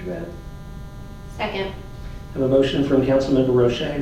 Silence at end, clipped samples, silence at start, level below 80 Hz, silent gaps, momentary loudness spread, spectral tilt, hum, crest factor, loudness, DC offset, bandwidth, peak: 0 s; under 0.1%; 0 s; -38 dBFS; none; 20 LU; -7 dB/octave; none; 16 dB; -20 LUFS; under 0.1%; 14 kHz; -6 dBFS